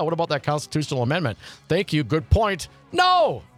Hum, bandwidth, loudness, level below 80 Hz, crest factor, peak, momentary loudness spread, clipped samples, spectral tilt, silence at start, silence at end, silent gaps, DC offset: none; 15 kHz; -22 LUFS; -38 dBFS; 16 dB; -6 dBFS; 9 LU; under 0.1%; -5.5 dB/octave; 0 s; 0.15 s; none; under 0.1%